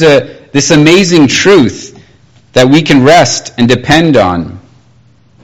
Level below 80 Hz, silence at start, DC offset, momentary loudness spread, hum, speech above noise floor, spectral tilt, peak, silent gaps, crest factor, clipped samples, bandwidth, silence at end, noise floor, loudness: -38 dBFS; 0 s; under 0.1%; 9 LU; none; 38 dB; -4.5 dB/octave; 0 dBFS; none; 8 dB; 4%; 14.5 kHz; 0.85 s; -44 dBFS; -7 LUFS